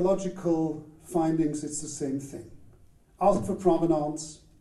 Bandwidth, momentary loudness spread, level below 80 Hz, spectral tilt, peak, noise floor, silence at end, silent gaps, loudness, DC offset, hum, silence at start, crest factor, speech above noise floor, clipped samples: 12.5 kHz; 14 LU; -54 dBFS; -6.5 dB/octave; -10 dBFS; -56 dBFS; 0.25 s; none; -28 LUFS; under 0.1%; none; 0 s; 18 dB; 29 dB; under 0.1%